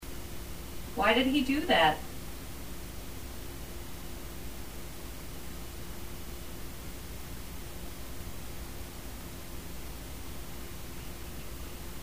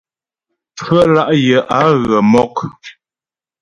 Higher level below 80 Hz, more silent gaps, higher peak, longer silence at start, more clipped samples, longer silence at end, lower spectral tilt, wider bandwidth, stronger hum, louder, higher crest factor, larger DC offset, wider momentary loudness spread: about the same, -46 dBFS vs -48 dBFS; neither; second, -12 dBFS vs 0 dBFS; second, 0 s vs 0.75 s; neither; second, 0 s vs 0.7 s; second, -4 dB/octave vs -6.5 dB/octave; first, 16 kHz vs 11 kHz; neither; second, -36 LUFS vs -12 LUFS; first, 24 dB vs 14 dB; first, 0.7% vs under 0.1%; first, 17 LU vs 12 LU